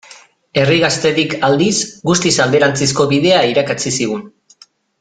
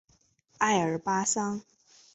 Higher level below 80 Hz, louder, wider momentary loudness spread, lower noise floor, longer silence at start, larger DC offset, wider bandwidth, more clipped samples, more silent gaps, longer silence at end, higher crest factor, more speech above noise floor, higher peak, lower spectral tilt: first, -50 dBFS vs -68 dBFS; first, -14 LUFS vs -28 LUFS; about the same, 6 LU vs 8 LU; second, -48 dBFS vs -67 dBFS; about the same, 0.55 s vs 0.6 s; neither; first, 9.6 kHz vs 8.4 kHz; neither; neither; first, 0.7 s vs 0.55 s; second, 14 dB vs 20 dB; second, 34 dB vs 39 dB; first, 0 dBFS vs -10 dBFS; about the same, -4 dB/octave vs -3.5 dB/octave